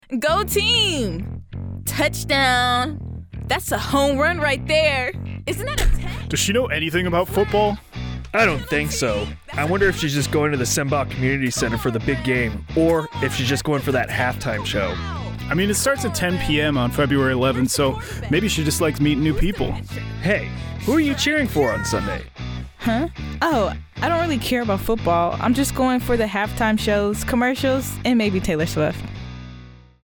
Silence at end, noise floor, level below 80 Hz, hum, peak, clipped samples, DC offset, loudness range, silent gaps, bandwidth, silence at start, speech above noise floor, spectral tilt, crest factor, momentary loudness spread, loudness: 0.25 s; -42 dBFS; -34 dBFS; none; -6 dBFS; under 0.1%; under 0.1%; 2 LU; none; over 20 kHz; 0.1 s; 22 dB; -4.5 dB/octave; 14 dB; 10 LU; -20 LUFS